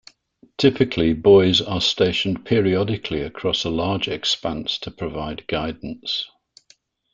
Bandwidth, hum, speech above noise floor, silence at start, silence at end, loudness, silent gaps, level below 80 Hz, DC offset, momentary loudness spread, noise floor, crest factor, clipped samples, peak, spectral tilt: 7.6 kHz; none; 38 dB; 0.6 s; 0.9 s; -20 LUFS; none; -46 dBFS; under 0.1%; 14 LU; -58 dBFS; 20 dB; under 0.1%; -2 dBFS; -5.5 dB/octave